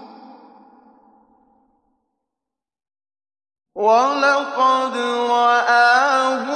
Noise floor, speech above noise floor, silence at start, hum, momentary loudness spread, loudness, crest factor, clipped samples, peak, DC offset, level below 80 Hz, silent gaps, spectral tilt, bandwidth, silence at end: -86 dBFS; 70 dB; 0 s; none; 8 LU; -16 LUFS; 16 dB; under 0.1%; -4 dBFS; under 0.1%; -80 dBFS; none; -2 dB/octave; 9.6 kHz; 0 s